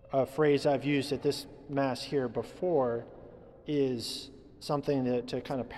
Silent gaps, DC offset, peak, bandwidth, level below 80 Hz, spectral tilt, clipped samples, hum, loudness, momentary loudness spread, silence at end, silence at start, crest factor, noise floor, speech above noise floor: none; under 0.1%; -14 dBFS; 14 kHz; -60 dBFS; -6 dB/octave; under 0.1%; none; -31 LUFS; 13 LU; 0 s; 0.05 s; 16 dB; -51 dBFS; 21 dB